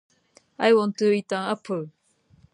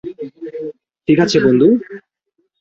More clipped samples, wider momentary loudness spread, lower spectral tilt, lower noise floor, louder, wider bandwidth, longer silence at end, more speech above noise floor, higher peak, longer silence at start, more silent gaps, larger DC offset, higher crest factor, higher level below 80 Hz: neither; second, 12 LU vs 20 LU; about the same, -5.5 dB/octave vs -6 dB/octave; second, -59 dBFS vs -68 dBFS; second, -23 LUFS vs -13 LUFS; first, 10.5 kHz vs 8 kHz; about the same, 0.65 s vs 0.65 s; second, 36 dB vs 54 dB; second, -6 dBFS vs -2 dBFS; first, 0.6 s vs 0.05 s; neither; neither; first, 20 dB vs 14 dB; second, -72 dBFS vs -54 dBFS